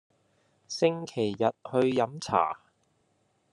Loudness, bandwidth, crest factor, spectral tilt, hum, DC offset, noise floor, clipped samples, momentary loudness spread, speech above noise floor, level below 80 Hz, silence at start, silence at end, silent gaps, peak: -28 LUFS; 11.5 kHz; 22 dB; -5.5 dB/octave; none; under 0.1%; -71 dBFS; under 0.1%; 5 LU; 44 dB; -72 dBFS; 0.7 s; 0.95 s; none; -8 dBFS